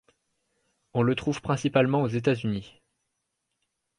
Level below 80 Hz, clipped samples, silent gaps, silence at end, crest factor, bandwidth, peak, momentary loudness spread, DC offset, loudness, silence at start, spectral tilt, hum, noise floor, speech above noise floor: -60 dBFS; under 0.1%; none; 1.3 s; 20 dB; 11 kHz; -10 dBFS; 9 LU; under 0.1%; -26 LUFS; 0.95 s; -7 dB/octave; none; -80 dBFS; 55 dB